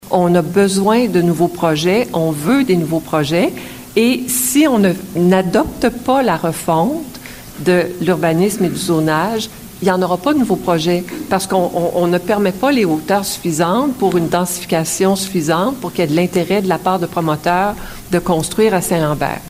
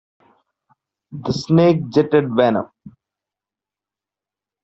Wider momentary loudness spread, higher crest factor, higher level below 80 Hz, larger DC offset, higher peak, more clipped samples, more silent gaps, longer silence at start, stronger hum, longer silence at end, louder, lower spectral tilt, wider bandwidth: second, 6 LU vs 16 LU; about the same, 14 dB vs 18 dB; first, -42 dBFS vs -56 dBFS; neither; about the same, -2 dBFS vs -2 dBFS; neither; neither; second, 0.05 s vs 1.1 s; neither; second, 0 s vs 1.75 s; about the same, -15 LUFS vs -17 LUFS; second, -5 dB/octave vs -7.5 dB/octave; first, 16 kHz vs 7.8 kHz